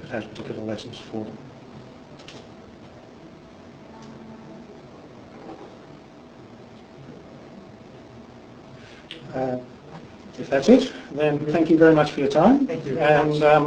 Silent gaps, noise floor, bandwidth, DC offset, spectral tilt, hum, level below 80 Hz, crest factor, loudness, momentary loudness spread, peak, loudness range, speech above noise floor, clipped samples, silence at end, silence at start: none; -45 dBFS; 9.2 kHz; under 0.1%; -6.5 dB/octave; none; -56 dBFS; 22 dB; -21 LUFS; 27 LU; -2 dBFS; 24 LU; 25 dB; under 0.1%; 0 s; 0 s